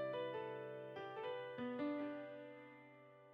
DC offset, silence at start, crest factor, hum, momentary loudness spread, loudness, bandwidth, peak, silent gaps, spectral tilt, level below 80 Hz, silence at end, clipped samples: under 0.1%; 0 s; 14 dB; none; 16 LU; -47 LUFS; 6.2 kHz; -34 dBFS; none; -7.5 dB/octave; under -90 dBFS; 0 s; under 0.1%